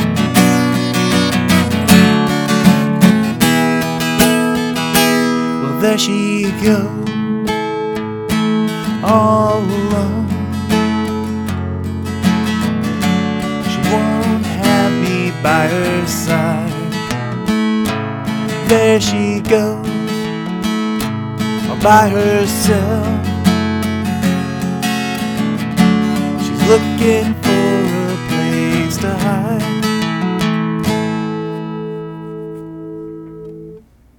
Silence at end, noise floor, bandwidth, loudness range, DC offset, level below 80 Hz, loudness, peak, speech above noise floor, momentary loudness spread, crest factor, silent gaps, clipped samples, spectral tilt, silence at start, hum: 0.4 s; -39 dBFS; 19 kHz; 5 LU; under 0.1%; -42 dBFS; -15 LUFS; 0 dBFS; 26 dB; 9 LU; 14 dB; none; under 0.1%; -5.5 dB/octave; 0 s; none